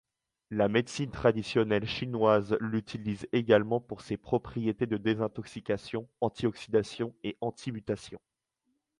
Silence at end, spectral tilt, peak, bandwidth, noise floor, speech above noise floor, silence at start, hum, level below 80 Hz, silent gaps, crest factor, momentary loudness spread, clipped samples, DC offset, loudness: 0.8 s; -6.5 dB/octave; -8 dBFS; 11 kHz; -80 dBFS; 50 dB; 0.5 s; none; -60 dBFS; none; 22 dB; 11 LU; under 0.1%; under 0.1%; -31 LUFS